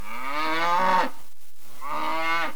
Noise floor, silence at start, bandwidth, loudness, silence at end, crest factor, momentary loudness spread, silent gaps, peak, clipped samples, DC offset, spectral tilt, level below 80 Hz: -53 dBFS; 0 s; over 20 kHz; -25 LUFS; 0 s; 16 dB; 11 LU; none; -10 dBFS; under 0.1%; 6%; -3.5 dB/octave; -62 dBFS